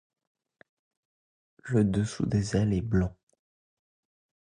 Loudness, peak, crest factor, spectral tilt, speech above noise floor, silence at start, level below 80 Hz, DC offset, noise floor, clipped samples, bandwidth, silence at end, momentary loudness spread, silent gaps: -28 LUFS; -12 dBFS; 18 dB; -7 dB/octave; over 64 dB; 1.65 s; -48 dBFS; under 0.1%; under -90 dBFS; under 0.1%; 10.5 kHz; 1.5 s; 5 LU; none